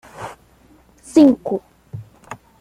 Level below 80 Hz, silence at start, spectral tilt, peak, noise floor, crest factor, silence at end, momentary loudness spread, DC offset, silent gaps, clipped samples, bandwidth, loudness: -56 dBFS; 0.2 s; -6.5 dB/octave; -2 dBFS; -51 dBFS; 18 dB; 0.25 s; 25 LU; under 0.1%; none; under 0.1%; 11.5 kHz; -16 LUFS